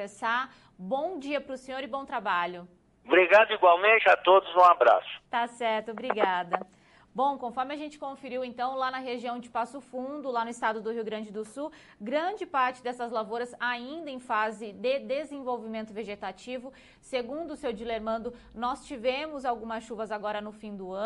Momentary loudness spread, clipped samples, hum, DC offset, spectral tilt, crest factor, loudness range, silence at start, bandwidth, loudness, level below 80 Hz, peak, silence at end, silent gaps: 18 LU; under 0.1%; none; under 0.1%; -4 dB/octave; 20 dB; 12 LU; 0 s; 11.5 kHz; -28 LUFS; -66 dBFS; -8 dBFS; 0 s; none